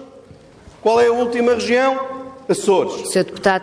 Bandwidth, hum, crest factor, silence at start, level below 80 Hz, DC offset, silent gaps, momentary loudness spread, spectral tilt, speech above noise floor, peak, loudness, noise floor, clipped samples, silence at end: 11 kHz; none; 16 dB; 0 s; -54 dBFS; under 0.1%; none; 8 LU; -4 dB/octave; 27 dB; -2 dBFS; -17 LUFS; -44 dBFS; under 0.1%; 0 s